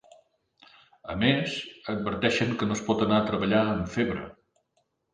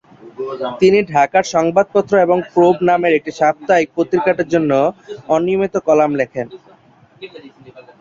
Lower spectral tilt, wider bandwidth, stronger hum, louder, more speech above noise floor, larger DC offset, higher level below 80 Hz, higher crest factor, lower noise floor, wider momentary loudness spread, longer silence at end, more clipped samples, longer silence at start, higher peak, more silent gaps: about the same, -5.5 dB/octave vs -6 dB/octave; first, 10 kHz vs 7.6 kHz; neither; second, -27 LUFS vs -15 LUFS; first, 48 dB vs 33 dB; neither; about the same, -54 dBFS vs -56 dBFS; first, 20 dB vs 14 dB; first, -74 dBFS vs -48 dBFS; second, 11 LU vs 14 LU; first, 0.8 s vs 0.2 s; neither; first, 1.05 s vs 0.25 s; second, -8 dBFS vs -2 dBFS; neither